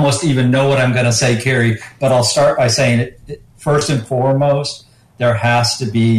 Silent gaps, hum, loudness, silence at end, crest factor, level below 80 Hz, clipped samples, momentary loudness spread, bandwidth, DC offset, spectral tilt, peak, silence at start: none; none; -14 LUFS; 0 s; 10 dB; -46 dBFS; under 0.1%; 8 LU; 13.5 kHz; under 0.1%; -5 dB/octave; -4 dBFS; 0 s